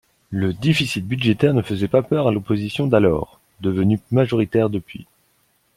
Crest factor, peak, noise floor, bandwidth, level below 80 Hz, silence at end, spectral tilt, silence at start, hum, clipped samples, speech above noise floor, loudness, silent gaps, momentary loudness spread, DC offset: 18 dB; -2 dBFS; -63 dBFS; 16 kHz; -50 dBFS; 0.75 s; -7 dB/octave; 0.3 s; none; under 0.1%; 44 dB; -20 LUFS; none; 10 LU; under 0.1%